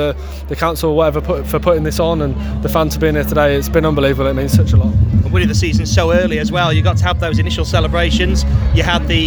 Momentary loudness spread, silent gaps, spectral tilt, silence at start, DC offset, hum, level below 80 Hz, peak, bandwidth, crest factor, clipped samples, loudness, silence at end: 5 LU; none; -6 dB/octave; 0 s; under 0.1%; none; -20 dBFS; 0 dBFS; over 20 kHz; 14 dB; under 0.1%; -14 LUFS; 0 s